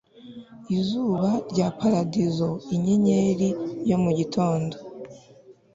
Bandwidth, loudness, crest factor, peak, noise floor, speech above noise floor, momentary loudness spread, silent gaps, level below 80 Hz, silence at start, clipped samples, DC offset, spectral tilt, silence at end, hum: 7.8 kHz; -24 LUFS; 16 dB; -8 dBFS; -52 dBFS; 29 dB; 21 LU; none; -58 dBFS; 0.2 s; under 0.1%; under 0.1%; -7.5 dB/octave; 0.2 s; none